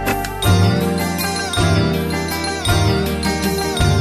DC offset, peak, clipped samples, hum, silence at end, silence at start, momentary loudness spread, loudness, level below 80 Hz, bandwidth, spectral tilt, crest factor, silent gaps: under 0.1%; -4 dBFS; under 0.1%; none; 0 s; 0 s; 5 LU; -17 LUFS; -30 dBFS; 14 kHz; -5 dB/octave; 14 dB; none